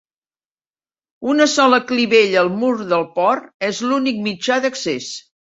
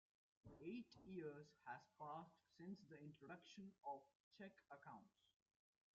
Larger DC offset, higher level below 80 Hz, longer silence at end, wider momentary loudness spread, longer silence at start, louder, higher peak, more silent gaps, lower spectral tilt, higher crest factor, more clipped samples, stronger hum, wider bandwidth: neither; first, -64 dBFS vs -88 dBFS; second, 0.4 s vs 0.85 s; about the same, 10 LU vs 8 LU; first, 1.2 s vs 0.45 s; first, -17 LUFS vs -59 LUFS; first, -2 dBFS vs -42 dBFS; second, 3.54-3.60 s vs 4.15-4.31 s; second, -3.5 dB/octave vs -5 dB/octave; about the same, 16 dB vs 18 dB; neither; neither; first, 8 kHz vs 7.2 kHz